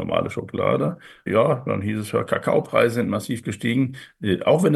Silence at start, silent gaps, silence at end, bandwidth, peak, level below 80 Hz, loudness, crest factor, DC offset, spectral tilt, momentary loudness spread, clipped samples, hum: 0 s; none; 0 s; 12.5 kHz; -4 dBFS; -58 dBFS; -23 LUFS; 18 dB; under 0.1%; -6.5 dB/octave; 8 LU; under 0.1%; none